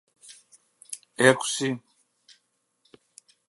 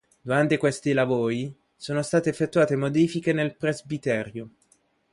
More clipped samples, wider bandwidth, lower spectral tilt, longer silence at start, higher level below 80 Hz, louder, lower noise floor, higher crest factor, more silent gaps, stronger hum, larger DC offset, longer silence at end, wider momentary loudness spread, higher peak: neither; about the same, 11.5 kHz vs 11.5 kHz; second, -3.5 dB/octave vs -6 dB/octave; about the same, 0.3 s vs 0.25 s; second, -76 dBFS vs -62 dBFS; about the same, -23 LUFS vs -25 LUFS; first, -72 dBFS vs -65 dBFS; first, 28 dB vs 18 dB; neither; neither; neither; first, 1.7 s vs 0.65 s; first, 20 LU vs 9 LU; first, -2 dBFS vs -8 dBFS